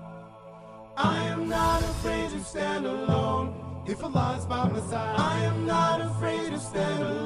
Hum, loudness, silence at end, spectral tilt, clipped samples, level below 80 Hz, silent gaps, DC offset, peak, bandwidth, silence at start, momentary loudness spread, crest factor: none; -28 LUFS; 0 s; -6 dB/octave; under 0.1%; -44 dBFS; none; under 0.1%; -12 dBFS; 14.5 kHz; 0 s; 13 LU; 16 dB